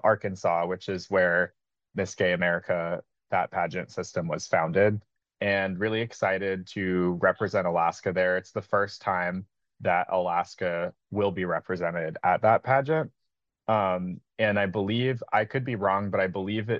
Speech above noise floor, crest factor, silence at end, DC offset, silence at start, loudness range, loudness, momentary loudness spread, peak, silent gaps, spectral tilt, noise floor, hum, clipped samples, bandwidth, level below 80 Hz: 56 dB; 18 dB; 0 s; under 0.1%; 0.05 s; 2 LU; -27 LUFS; 9 LU; -8 dBFS; none; -6 dB/octave; -83 dBFS; none; under 0.1%; 7.8 kHz; -70 dBFS